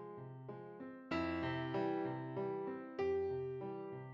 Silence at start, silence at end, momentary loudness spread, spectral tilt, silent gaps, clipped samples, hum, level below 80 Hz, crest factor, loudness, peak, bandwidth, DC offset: 0 s; 0 s; 12 LU; -8 dB/octave; none; under 0.1%; none; -70 dBFS; 14 dB; -42 LUFS; -28 dBFS; 7.2 kHz; under 0.1%